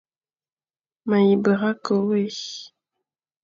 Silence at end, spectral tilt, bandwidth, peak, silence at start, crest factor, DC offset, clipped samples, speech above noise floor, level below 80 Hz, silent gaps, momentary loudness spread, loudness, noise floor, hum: 0.75 s; -6.5 dB/octave; 7.4 kHz; -8 dBFS; 1.05 s; 16 dB; under 0.1%; under 0.1%; over 69 dB; -70 dBFS; none; 16 LU; -21 LUFS; under -90 dBFS; none